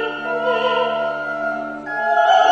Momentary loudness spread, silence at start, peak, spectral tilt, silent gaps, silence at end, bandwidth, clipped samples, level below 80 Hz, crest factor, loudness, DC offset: 9 LU; 0 s; -4 dBFS; -3 dB/octave; none; 0 s; 7.8 kHz; under 0.1%; -58 dBFS; 14 dB; -19 LUFS; under 0.1%